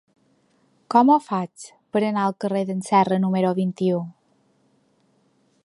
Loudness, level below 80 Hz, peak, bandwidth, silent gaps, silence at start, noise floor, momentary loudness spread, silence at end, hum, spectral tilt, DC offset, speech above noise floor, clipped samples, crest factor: -21 LUFS; -72 dBFS; -4 dBFS; 11.5 kHz; none; 0.9 s; -64 dBFS; 10 LU; 1.55 s; none; -7 dB/octave; under 0.1%; 43 dB; under 0.1%; 20 dB